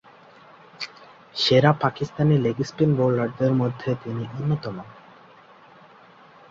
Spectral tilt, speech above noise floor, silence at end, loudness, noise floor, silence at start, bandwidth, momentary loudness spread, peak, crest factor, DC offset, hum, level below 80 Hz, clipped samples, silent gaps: -7 dB/octave; 28 dB; 1.6 s; -22 LUFS; -50 dBFS; 0.8 s; 7.6 kHz; 18 LU; -4 dBFS; 20 dB; under 0.1%; none; -58 dBFS; under 0.1%; none